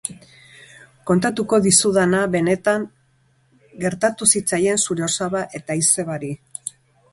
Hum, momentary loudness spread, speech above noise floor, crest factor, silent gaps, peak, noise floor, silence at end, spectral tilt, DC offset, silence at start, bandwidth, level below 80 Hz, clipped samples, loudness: none; 17 LU; 41 dB; 20 dB; none; 0 dBFS; -60 dBFS; 0.45 s; -3.5 dB/octave; under 0.1%; 0.05 s; 12 kHz; -56 dBFS; under 0.1%; -18 LUFS